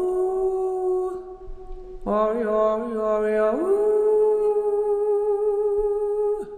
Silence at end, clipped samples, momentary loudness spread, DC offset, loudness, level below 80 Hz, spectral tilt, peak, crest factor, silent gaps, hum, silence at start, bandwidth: 0 s; under 0.1%; 14 LU; under 0.1%; -22 LUFS; -44 dBFS; -7.5 dB/octave; -10 dBFS; 14 dB; none; none; 0 s; 9.6 kHz